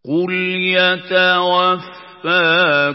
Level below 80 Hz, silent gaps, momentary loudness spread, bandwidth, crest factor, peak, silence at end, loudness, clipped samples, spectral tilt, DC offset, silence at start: -72 dBFS; none; 8 LU; 5.8 kHz; 14 dB; -2 dBFS; 0 s; -14 LUFS; under 0.1%; -9 dB/octave; under 0.1%; 0.05 s